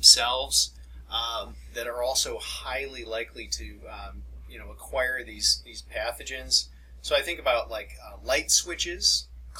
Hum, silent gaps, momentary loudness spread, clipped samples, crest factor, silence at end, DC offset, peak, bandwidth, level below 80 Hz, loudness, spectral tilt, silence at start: none; none; 19 LU; under 0.1%; 26 dB; 0 s; under 0.1%; -2 dBFS; 17 kHz; -44 dBFS; -26 LUFS; 0 dB/octave; 0 s